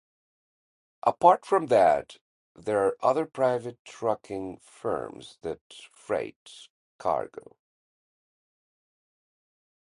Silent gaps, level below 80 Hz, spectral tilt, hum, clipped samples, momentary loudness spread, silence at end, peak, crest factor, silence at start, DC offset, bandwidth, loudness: 2.21-2.55 s, 3.79-3.85 s, 5.61-5.70 s, 6.36-6.46 s, 6.70-6.99 s; -66 dBFS; -5.5 dB/octave; none; under 0.1%; 20 LU; 2.75 s; -4 dBFS; 24 dB; 1.05 s; under 0.1%; 11.5 kHz; -27 LUFS